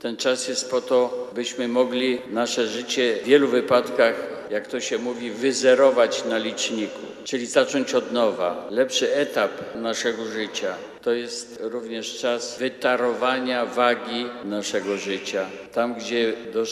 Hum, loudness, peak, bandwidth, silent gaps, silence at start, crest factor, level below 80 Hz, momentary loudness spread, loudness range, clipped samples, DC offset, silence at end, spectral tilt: none; -23 LUFS; -4 dBFS; 13.5 kHz; none; 0 s; 20 dB; -70 dBFS; 11 LU; 5 LU; under 0.1%; under 0.1%; 0 s; -2.5 dB/octave